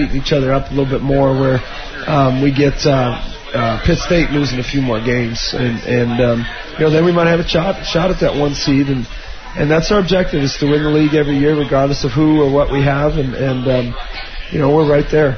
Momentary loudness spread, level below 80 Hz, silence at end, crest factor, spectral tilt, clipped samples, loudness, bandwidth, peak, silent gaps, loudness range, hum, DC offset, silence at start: 7 LU; -28 dBFS; 0 s; 14 dB; -6.5 dB/octave; under 0.1%; -15 LUFS; 6.6 kHz; -2 dBFS; none; 2 LU; none; 1%; 0 s